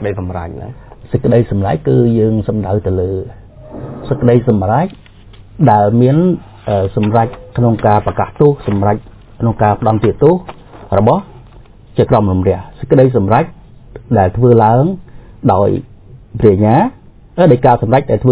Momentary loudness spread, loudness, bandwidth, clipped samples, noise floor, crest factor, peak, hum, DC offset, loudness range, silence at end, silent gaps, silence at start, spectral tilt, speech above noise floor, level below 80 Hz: 12 LU; -13 LUFS; 4 kHz; 0.3%; -38 dBFS; 12 dB; 0 dBFS; none; under 0.1%; 3 LU; 0 s; none; 0 s; -12.5 dB/octave; 27 dB; -32 dBFS